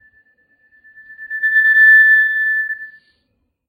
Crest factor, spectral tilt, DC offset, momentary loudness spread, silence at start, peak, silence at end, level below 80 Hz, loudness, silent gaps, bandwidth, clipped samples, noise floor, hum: 14 dB; -0.5 dB/octave; under 0.1%; 18 LU; 1.1 s; -2 dBFS; 0.8 s; -68 dBFS; -10 LUFS; none; 16 kHz; under 0.1%; -68 dBFS; none